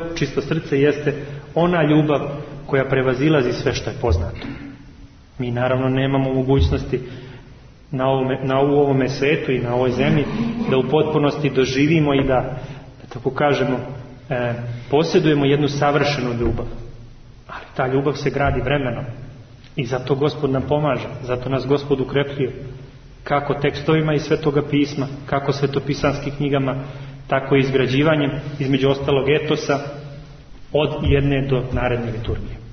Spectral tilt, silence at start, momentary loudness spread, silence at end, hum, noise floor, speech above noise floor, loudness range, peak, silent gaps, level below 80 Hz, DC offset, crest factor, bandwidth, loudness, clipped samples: -7 dB/octave; 0 s; 15 LU; 0 s; none; -43 dBFS; 24 dB; 4 LU; -4 dBFS; none; -36 dBFS; under 0.1%; 16 dB; 6.6 kHz; -20 LUFS; under 0.1%